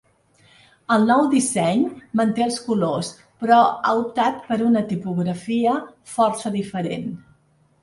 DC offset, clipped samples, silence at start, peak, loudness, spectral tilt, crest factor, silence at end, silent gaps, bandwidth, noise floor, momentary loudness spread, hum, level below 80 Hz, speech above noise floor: under 0.1%; under 0.1%; 0.9 s; -4 dBFS; -21 LUFS; -5.5 dB/octave; 18 dB; 0.65 s; none; 11.5 kHz; -59 dBFS; 12 LU; none; -62 dBFS; 39 dB